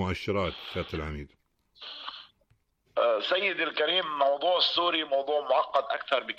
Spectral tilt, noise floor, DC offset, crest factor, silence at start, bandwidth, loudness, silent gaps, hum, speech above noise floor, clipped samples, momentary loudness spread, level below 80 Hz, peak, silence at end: -5.5 dB/octave; -70 dBFS; under 0.1%; 16 dB; 0 s; 9 kHz; -27 LUFS; none; none; 42 dB; under 0.1%; 16 LU; -52 dBFS; -12 dBFS; 0.05 s